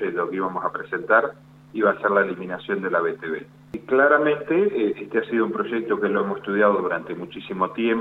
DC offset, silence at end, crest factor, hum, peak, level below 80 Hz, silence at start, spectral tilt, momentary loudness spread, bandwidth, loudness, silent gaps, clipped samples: under 0.1%; 0 s; 18 dB; none; -4 dBFS; -64 dBFS; 0 s; -8 dB/octave; 12 LU; 4.3 kHz; -22 LUFS; none; under 0.1%